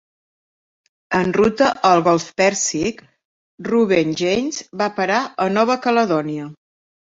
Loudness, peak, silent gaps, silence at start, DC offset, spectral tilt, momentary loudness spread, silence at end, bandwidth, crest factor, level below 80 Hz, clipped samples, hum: -18 LUFS; -2 dBFS; 3.25-3.58 s; 1.1 s; under 0.1%; -4 dB/octave; 9 LU; 0.6 s; 7.8 kHz; 18 dB; -54 dBFS; under 0.1%; none